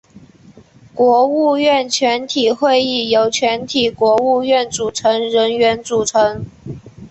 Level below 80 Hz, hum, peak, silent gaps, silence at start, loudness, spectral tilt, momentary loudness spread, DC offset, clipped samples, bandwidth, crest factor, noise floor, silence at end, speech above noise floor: -52 dBFS; none; -2 dBFS; none; 0.15 s; -15 LUFS; -3 dB/octave; 7 LU; under 0.1%; under 0.1%; 8.6 kHz; 14 dB; -44 dBFS; 0.05 s; 30 dB